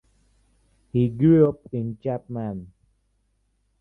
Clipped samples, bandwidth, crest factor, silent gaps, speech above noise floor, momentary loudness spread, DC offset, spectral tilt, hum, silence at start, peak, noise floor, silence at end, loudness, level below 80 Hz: under 0.1%; 3.9 kHz; 18 dB; none; 47 dB; 15 LU; under 0.1%; -11.5 dB/octave; none; 0.95 s; -6 dBFS; -69 dBFS; 1.15 s; -23 LUFS; -54 dBFS